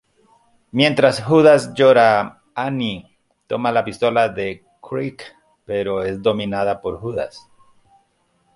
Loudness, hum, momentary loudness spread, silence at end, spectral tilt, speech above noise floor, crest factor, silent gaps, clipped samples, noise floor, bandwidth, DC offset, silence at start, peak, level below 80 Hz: -18 LUFS; none; 16 LU; 1.2 s; -6 dB/octave; 46 dB; 18 dB; none; under 0.1%; -63 dBFS; 11.5 kHz; under 0.1%; 0.75 s; -2 dBFS; -54 dBFS